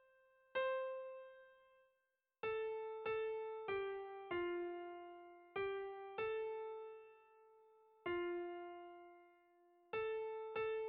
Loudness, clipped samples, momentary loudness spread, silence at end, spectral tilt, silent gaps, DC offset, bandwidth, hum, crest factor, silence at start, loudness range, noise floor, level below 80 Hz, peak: -45 LUFS; under 0.1%; 15 LU; 0 s; -2.5 dB/octave; none; under 0.1%; 4.8 kHz; none; 16 dB; 0.55 s; 4 LU; -87 dBFS; -80 dBFS; -32 dBFS